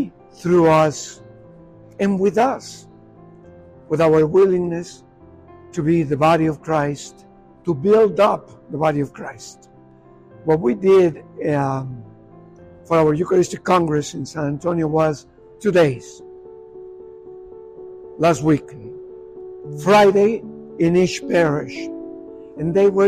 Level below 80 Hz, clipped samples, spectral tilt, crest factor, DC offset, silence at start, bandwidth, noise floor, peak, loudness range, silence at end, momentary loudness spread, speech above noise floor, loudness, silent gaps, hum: -52 dBFS; under 0.1%; -6.5 dB/octave; 14 dB; under 0.1%; 0 s; 14 kHz; -47 dBFS; -4 dBFS; 4 LU; 0 s; 24 LU; 29 dB; -18 LUFS; none; none